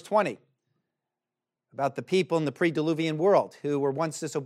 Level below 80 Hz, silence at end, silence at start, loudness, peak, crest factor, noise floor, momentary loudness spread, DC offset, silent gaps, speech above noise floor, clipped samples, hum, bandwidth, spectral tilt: -82 dBFS; 0 s; 0.05 s; -27 LUFS; -10 dBFS; 18 dB; -89 dBFS; 8 LU; under 0.1%; none; 63 dB; under 0.1%; none; 13.5 kHz; -6 dB/octave